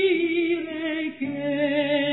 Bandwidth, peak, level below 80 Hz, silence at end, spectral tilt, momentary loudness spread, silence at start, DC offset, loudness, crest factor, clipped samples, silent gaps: 4.1 kHz; -12 dBFS; -72 dBFS; 0 s; -8.5 dB/octave; 6 LU; 0 s; under 0.1%; -25 LUFS; 12 dB; under 0.1%; none